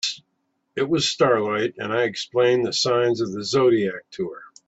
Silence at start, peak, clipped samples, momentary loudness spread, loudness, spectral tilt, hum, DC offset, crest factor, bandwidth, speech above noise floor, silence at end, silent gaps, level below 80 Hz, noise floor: 0.05 s; -6 dBFS; under 0.1%; 12 LU; -22 LUFS; -4 dB/octave; none; under 0.1%; 16 dB; 8 kHz; 51 dB; 0.25 s; none; -64 dBFS; -73 dBFS